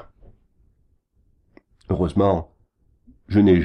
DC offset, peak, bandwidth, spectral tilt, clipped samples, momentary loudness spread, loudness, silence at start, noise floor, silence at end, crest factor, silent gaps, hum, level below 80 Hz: under 0.1%; -6 dBFS; 9.4 kHz; -9.5 dB/octave; under 0.1%; 11 LU; -21 LUFS; 1.9 s; -63 dBFS; 0 s; 18 dB; none; none; -44 dBFS